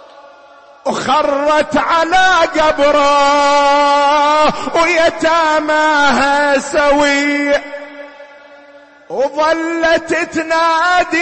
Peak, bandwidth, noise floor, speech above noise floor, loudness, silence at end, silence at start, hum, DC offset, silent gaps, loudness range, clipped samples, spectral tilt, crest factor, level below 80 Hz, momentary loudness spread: -4 dBFS; 8.8 kHz; -41 dBFS; 29 dB; -12 LUFS; 0 s; 0.15 s; none; under 0.1%; none; 5 LU; under 0.1%; -2.5 dB/octave; 10 dB; -42 dBFS; 8 LU